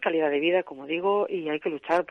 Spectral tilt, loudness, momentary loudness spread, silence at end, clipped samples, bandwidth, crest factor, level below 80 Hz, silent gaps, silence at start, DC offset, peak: -6 dB/octave; -26 LUFS; 6 LU; 0.05 s; under 0.1%; 9.4 kHz; 18 dB; -70 dBFS; none; 0 s; under 0.1%; -8 dBFS